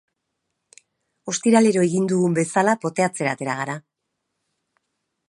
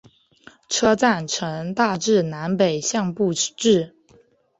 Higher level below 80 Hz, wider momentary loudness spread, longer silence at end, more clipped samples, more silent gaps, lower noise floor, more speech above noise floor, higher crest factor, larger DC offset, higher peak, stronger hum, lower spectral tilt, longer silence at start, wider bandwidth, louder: second, -70 dBFS vs -62 dBFS; first, 12 LU vs 7 LU; first, 1.5 s vs 0.7 s; neither; neither; first, -78 dBFS vs -56 dBFS; first, 59 dB vs 36 dB; about the same, 20 dB vs 18 dB; neither; about the same, -4 dBFS vs -4 dBFS; neither; first, -5.5 dB/octave vs -4 dB/octave; first, 1.25 s vs 0.7 s; first, 11.5 kHz vs 8.2 kHz; about the same, -20 LUFS vs -21 LUFS